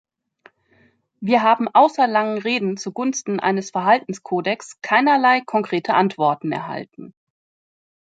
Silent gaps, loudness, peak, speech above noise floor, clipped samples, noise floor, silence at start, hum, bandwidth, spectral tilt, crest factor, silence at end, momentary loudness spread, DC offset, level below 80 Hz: none; -19 LUFS; -2 dBFS; 40 dB; under 0.1%; -59 dBFS; 1.2 s; none; 9.2 kHz; -4.5 dB/octave; 18 dB; 0.9 s; 11 LU; under 0.1%; -72 dBFS